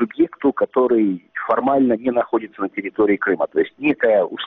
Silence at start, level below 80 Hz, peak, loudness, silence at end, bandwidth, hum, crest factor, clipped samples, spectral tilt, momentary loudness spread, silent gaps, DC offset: 0 s; -60 dBFS; -4 dBFS; -19 LUFS; 0 s; 4 kHz; none; 14 dB; under 0.1%; -4 dB/octave; 6 LU; none; under 0.1%